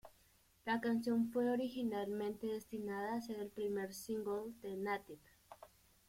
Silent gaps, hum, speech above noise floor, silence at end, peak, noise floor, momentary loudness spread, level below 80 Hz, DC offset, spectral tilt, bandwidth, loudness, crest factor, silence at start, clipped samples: none; none; 31 dB; 0.45 s; -26 dBFS; -71 dBFS; 13 LU; -76 dBFS; under 0.1%; -5.5 dB/octave; 16.5 kHz; -41 LUFS; 16 dB; 0.05 s; under 0.1%